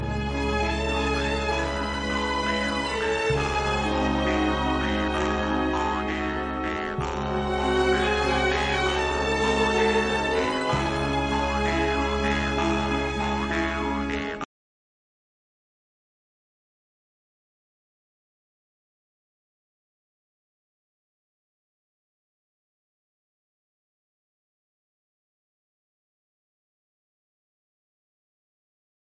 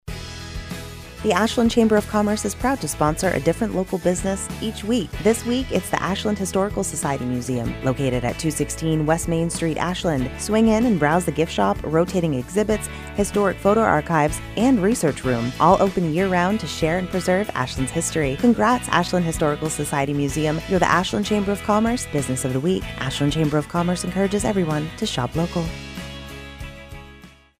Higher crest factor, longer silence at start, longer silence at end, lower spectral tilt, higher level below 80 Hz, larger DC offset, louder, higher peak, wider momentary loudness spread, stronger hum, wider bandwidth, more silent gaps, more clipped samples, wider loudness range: about the same, 16 dB vs 18 dB; about the same, 0 s vs 0.05 s; first, 14.65 s vs 0.3 s; about the same, -5 dB/octave vs -5 dB/octave; about the same, -38 dBFS vs -38 dBFS; neither; second, -25 LUFS vs -21 LUFS; second, -12 dBFS vs -2 dBFS; second, 6 LU vs 9 LU; neither; second, 10 kHz vs 15.5 kHz; neither; neither; first, 6 LU vs 3 LU